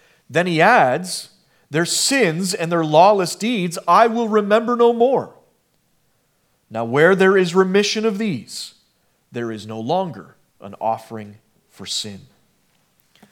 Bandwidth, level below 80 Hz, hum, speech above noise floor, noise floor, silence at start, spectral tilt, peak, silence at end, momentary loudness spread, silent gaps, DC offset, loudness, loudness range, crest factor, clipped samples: 17.5 kHz; -74 dBFS; none; 47 dB; -64 dBFS; 0.3 s; -4 dB/octave; 0 dBFS; 1.15 s; 18 LU; none; under 0.1%; -17 LUFS; 11 LU; 18 dB; under 0.1%